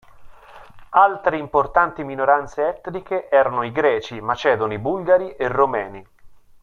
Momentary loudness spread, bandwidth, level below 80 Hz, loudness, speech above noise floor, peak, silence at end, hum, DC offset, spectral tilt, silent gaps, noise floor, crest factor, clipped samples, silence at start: 9 LU; 7 kHz; -50 dBFS; -20 LUFS; 25 dB; -2 dBFS; 0.25 s; none; under 0.1%; -6.5 dB/octave; none; -45 dBFS; 18 dB; under 0.1%; 0.15 s